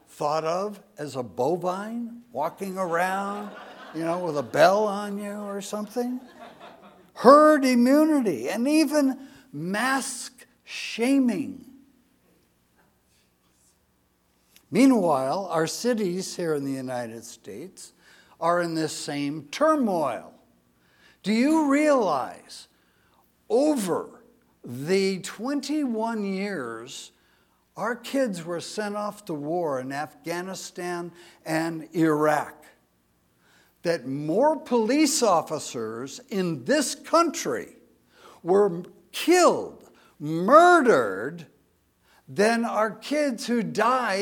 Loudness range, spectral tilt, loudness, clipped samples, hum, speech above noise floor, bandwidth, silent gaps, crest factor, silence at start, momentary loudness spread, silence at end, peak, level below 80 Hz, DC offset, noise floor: 9 LU; -4.5 dB/octave; -24 LUFS; under 0.1%; none; 43 dB; 18 kHz; none; 24 dB; 0.15 s; 18 LU; 0 s; 0 dBFS; -74 dBFS; under 0.1%; -67 dBFS